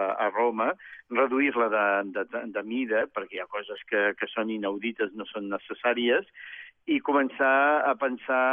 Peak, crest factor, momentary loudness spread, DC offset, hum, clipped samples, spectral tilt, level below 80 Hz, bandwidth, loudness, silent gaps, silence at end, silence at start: -12 dBFS; 16 dB; 11 LU; under 0.1%; none; under 0.1%; -1.5 dB/octave; -78 dBFS; 3.7 kHz; -27 LUFS; none; 0 s; 0 s